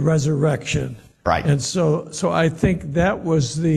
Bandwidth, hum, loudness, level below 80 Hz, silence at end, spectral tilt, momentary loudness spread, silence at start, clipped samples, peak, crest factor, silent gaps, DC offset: 12 kHz; none; -20 LUFS; -40 dBFS; 0 s; -6 dB/octave; 5 LU; 0 s; under 0.1%; -4 dBFS; 16 dB; none; under 0.1%